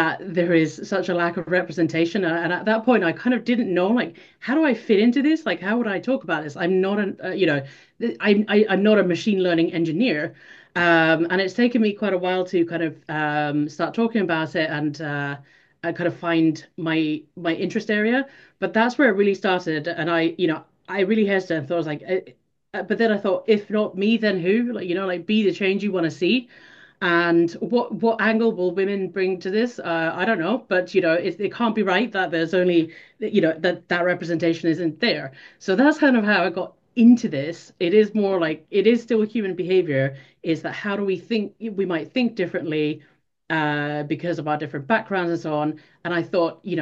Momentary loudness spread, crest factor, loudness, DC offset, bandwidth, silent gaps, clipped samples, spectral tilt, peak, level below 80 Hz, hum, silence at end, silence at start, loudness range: 9 LU; 18 dB; -22 LUFS; under 0.1%; 7.6 kHz; none; under 0.1%; -6.5 dB/octave; -4 dBFS; -70 dBFS; none; 0 s; 0 s; 5 LU